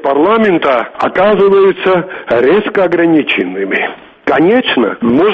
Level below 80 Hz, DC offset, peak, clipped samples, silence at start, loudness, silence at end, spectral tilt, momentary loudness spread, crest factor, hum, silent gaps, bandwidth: -48 dBFS; under 0.1%; 0 dBFS; under 0.1%; 0 s; -11 LUFS; 0 s; -7.5 dB/octave; 6 LU; 10 dB; none; none; 5.8 kHz